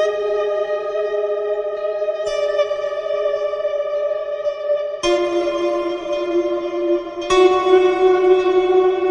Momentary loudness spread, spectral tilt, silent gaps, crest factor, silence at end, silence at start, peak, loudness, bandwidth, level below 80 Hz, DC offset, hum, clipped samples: 8 LU; -4 dB/octave; none; 16 dB; 0 s; 0 s; -2 dBFS; -19 LUFS; 9.8 kHz; -50 dBFS; under 0.1%; none; under 0.1%